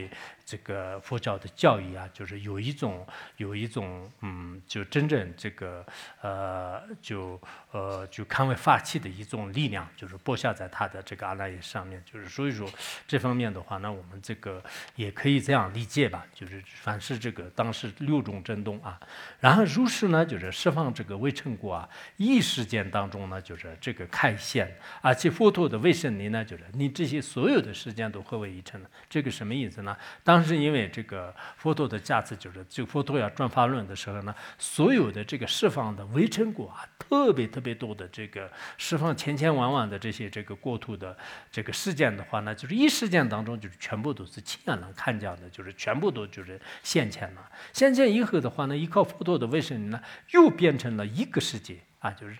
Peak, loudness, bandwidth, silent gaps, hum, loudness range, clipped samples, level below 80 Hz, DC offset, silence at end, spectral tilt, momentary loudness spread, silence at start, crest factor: -2 dBFS; -28 LUFS; 19.5 kHz; none; none; 7 LU; under 0.1%; -68 dBFS; under 0.1%; 0 s; -5.5 dB/octave; 17 LU; 0 s; 28 dB